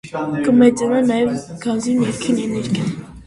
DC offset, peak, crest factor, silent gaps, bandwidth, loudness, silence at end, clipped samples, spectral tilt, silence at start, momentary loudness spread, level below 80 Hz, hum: under 0.1%; 0 dBFS; 18 dB; none; 11.5 kHz; -18 LUFS; 0.05 s; under 0.1%; -6 dB/octave; 0.05 s; 10 LU; -50 dBFS; none